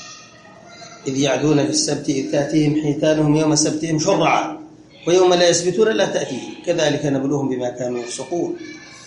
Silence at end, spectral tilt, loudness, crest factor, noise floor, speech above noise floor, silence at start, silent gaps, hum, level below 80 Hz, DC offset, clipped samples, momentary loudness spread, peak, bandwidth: 0 s; -4.5 dB/octave; -18 LUFS; 16 dB; -43 dBFS; 25 dB; 0 s; none; none; -60 dBFS; under 0.1%; under 0.1%; 12 LU; -2 dBFS; 10.5 kHz